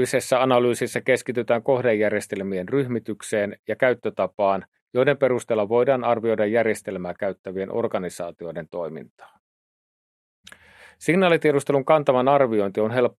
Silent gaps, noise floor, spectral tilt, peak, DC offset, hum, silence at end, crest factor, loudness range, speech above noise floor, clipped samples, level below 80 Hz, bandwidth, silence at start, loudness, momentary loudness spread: 3.59-3.64 s, 4.68-4.72 s, 4.82-4.87 s, 7.39-7.44 s, 9.10-9.17 s, 9.39-10.44 s; -49 dBFS; -5.5 dB/octave; -4 dBFS; under 0.1%; none; 0.1 s; 20 dB; 9 LU; 27 dB; under 0.1%; -70 dBFS; 13 kHz; 0 s; -22 LUFS; 12 LU